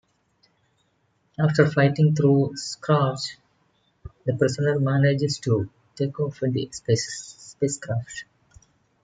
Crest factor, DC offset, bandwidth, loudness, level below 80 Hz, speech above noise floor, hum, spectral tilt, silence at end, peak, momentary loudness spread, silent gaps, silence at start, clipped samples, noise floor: 22 dB; under 0.1%; 9.4 kHz; -23 LUFS; -60 dBFS; 46 dB; none; -6 dB/octave; 0.8 s; -2 dBFS; 13 LU; none; 1.4 s; under 0.1%; -68 dBFS